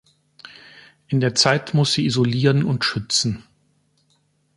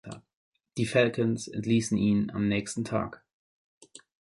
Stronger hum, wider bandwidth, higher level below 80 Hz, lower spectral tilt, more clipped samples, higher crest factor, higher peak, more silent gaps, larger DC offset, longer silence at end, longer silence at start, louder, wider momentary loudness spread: neither; about the same, 11.5 kHz vs 11.5 kHz; about the same, -56 dBFS vs -58 dBFS; second, -4.5 dB/octave vs -6 dB/octave; neither; about the same, 20 dB vs 20 dB; first, -2 dBFS vs -8 dBFS; second, none vs 0.34-0.52 s; neither; about the same, 1.15 s vs 1.25 s; first, 1.1 s vs 0.05 s; first, -19 LUFS vs -28 LUFS; second, 11 LU vs 14 LU